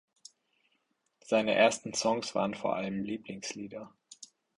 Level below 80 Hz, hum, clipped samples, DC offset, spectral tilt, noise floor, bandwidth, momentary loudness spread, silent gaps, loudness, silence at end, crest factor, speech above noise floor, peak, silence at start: -72 dBFS; none; under 0.1%; under 0.1%; -3.5 dB/octave; -77 dBFS; 11.5 kHz; 24 LU; none; -31 LUFS; 0.35 s; 22 dB; 46 dB; -10 dBFS; 1.25 s